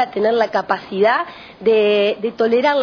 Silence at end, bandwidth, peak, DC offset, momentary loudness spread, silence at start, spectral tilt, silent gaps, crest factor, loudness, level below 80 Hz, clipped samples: 0 s; 5.4 kHz; -2 dBFS; under 0.1%; 7 LU; 0 s; -6 dB/octave; none; 16 dB; -17 LUFS; -62 dBFS; under 0.1%